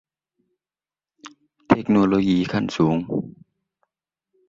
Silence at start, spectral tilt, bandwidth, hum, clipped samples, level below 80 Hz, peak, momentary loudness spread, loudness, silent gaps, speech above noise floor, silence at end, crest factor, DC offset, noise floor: 1.25 s; -7.5 dB/octave; 7.6 kHz; none; under 0.1%; -54 dBFS; -2 dBFS; 11 LU; -21 LUFS; none; over 70 dB; 1.2 s; 22 dB; under 0.1%; under -90 dBFS